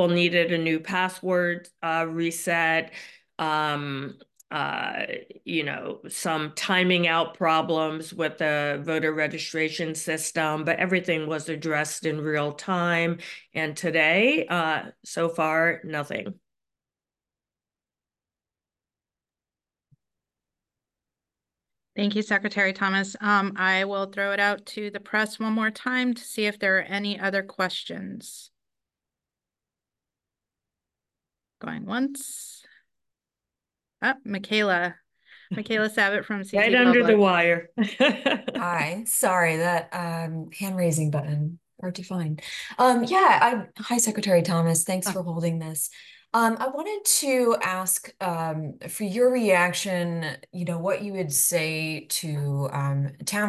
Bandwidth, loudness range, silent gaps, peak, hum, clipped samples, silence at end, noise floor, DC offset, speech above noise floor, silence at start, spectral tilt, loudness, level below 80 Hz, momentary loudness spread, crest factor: 13 kHz; 10 LU; none; -6 dBFS; none; under 0.1%; 0 s; under -90 dBFS; under 0.1%; over 65 dB; 0 s; -4 dB/octave; -24 LUFS; -74 dBFS; 13 LU; 20 dB